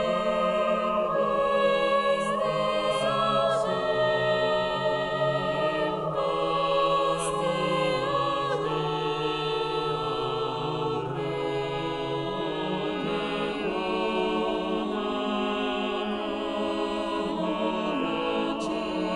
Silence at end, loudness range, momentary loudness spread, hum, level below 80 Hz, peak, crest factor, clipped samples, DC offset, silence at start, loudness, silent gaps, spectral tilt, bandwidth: 0 s; 4 LU; 5 LU; none; -54 dBFS; -12 dBFS; 14 dB; under 0.1%; under 0.1%; 0 s; -27 LUFS; none; -5 dB/octave; 11.5 kHz